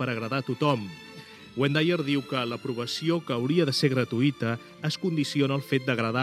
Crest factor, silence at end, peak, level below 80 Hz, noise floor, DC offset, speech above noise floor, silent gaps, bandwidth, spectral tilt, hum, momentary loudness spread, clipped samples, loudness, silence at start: 18 dB; 0 s; -8 dBFS; -72 dBFS; -46 dBFS; under 0.1%; 20 dB; none; 14.5 kHz; -6 dB/octave; none; 8 LU; under 0.1%; -27 LUFS; 0 s